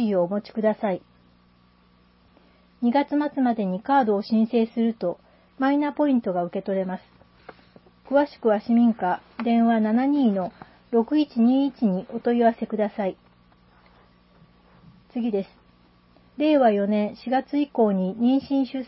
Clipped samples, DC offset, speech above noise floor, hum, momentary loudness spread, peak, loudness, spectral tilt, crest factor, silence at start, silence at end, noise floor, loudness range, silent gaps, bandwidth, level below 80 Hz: under 0.1%; under 0.1%; 36 dB; 60 Hz at -45 dBFS; 8 LU; -8 dBFS; -23 LUFS; -11.5 dB/octave; 16 dB; 0 s; 0 s; -58 dBFS; 6 LU; none; 5.8 kHz; -64 dBFS